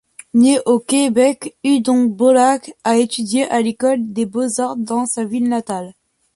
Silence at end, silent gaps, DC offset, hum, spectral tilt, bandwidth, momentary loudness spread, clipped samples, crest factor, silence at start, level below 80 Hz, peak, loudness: 0.45 s; none; under 0.1%; none; -4 dB/octave; 11.5 kHz; 8 LU; under 0.1%; 14 dB; 0.35 s; -62 dBFS; -2 dBFS; -16 LUFS